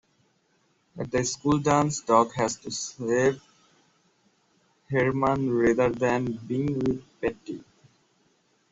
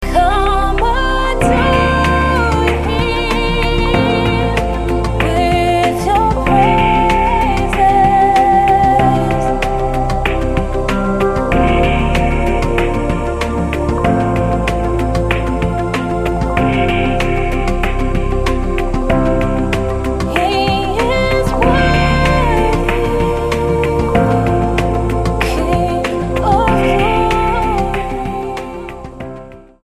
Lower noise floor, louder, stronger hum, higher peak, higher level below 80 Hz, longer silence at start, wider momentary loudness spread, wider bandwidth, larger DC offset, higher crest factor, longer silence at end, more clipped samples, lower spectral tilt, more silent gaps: first, -68 dBFS vs -33 dBFS; second, -26 LUFS vs -14 LUFS; neither; second, -6 dBFS vs 0 dBFS; second, -56 dBFS vs -20 dBFS; first, 0.95 s vs 0 s; first, 10 LU vs 6 LU; second, 8.2 kHz vs 14.5 kHz; second, under 0.1% vs 0.2%; first, 22 dB vs 14 dB; first, 1.1 s vs 0.25 s; neither; about the same, -5.5 dB/octave vs -6.5 dB/octave; neither